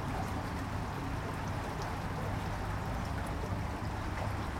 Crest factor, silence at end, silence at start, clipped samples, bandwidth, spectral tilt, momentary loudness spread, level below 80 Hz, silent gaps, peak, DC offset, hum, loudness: 14 dB; 0 s; 0 s; under 0.1%; 16.5 kHz; -6 dB/octave; 1 LU; -44 dBFS; none; -22 dBFS; under 0.1%; none; -38 LUFS